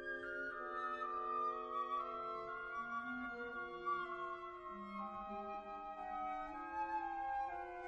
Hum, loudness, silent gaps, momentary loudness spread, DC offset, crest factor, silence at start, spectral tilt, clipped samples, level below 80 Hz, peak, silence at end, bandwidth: none; -44 LUFS; none; 6 LU; under 0.1%; 14 dB; 0 s; -5.5 dB/octave; under 0.1%; -70 dBFS; -30 dBFS; 0 s; 9 kHz